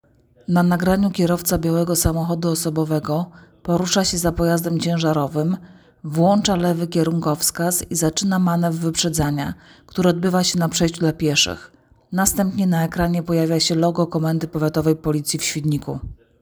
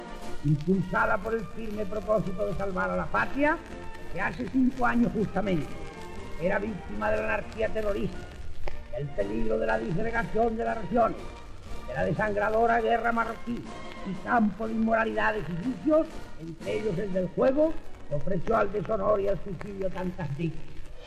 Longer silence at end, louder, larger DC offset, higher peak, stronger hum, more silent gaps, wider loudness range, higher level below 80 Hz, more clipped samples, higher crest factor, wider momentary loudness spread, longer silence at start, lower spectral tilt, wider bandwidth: first, 0.3 s vs 0 s; first, -20 LUFS vs -29 LUFS; neither; first, -2 dBFS vs -16 dBFS; neither; neither; about the same, 1 LU vs 3 LU; about the same, -42 dBFS vs -40 dBFS; neither; first, 18 dB vs 12 dB; second, 8 LU vs 16 LU; first, 0.5 s vs 0 s; second, -5 dB/octave vs -7.5 dB/octave; first, over 20 kHz vs 10 kHz